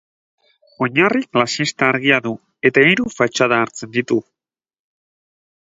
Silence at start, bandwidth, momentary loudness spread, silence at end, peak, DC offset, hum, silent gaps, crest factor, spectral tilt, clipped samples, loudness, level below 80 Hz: 0.8 s; 8 kHz; 9 LU; 1.55 s; 0 dBFS; under 0.1%; none; none; 20 dB; -4.5 dB/octave; under 0.1%; -16 LUFS; -60 dBFS